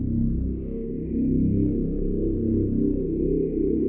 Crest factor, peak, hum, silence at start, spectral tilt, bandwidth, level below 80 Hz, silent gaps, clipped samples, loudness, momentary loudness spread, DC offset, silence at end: 12 dB; -12 dBFS; none; 0 s; -15.5 dB/octave; 2.6 kHz; -32 dBFS; none; under 0.1%; -25 LUFS; 7 LU; under 0.1%; 0 s